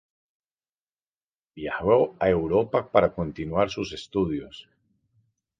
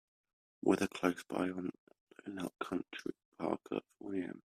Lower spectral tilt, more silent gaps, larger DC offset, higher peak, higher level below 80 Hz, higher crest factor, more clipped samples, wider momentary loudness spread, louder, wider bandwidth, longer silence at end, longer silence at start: first, -7 dB/octave vs -5.5 dB/octave; second, none vs 1.78-1.87 s, 2.01-2.07 s, 3.25-3.32 s; neither; first, -4 dBFS vs -16 dBFS; first, -50 dBFS vs -74 dBFS; about the same, 24 dB vs 24 dB; neither; about the same, 12 LU vs 12 LU; first, -25 LUFS vs -39 LUFS; second, 9 kHz vs 14.5 kHz; first, 1 s vs 0.1 s; first, 1.55 s vs 0.65 s